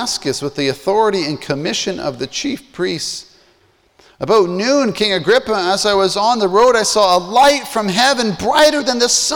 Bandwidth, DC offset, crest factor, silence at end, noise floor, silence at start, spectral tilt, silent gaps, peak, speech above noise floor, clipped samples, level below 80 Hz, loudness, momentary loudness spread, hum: over 20 kHz; under 0.1%; 14 dB; 0 s; -55 dBFS; 0 s; -3 dB/octave; none; -2 dBFS; 40 dB; under 0.1%; -48 dBFS; -15 LUFS; 10 LU; none